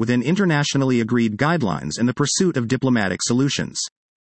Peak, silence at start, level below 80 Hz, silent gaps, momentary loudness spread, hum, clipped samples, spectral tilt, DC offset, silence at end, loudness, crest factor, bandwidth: -4 dBFS; 0 s; -56 dBFS; none; 5 LU; none; under 0.1%; -4.5 dB/octave; under 0.1%; 0.35 s; -20 LUFS; 16 dB; 8.8 kHz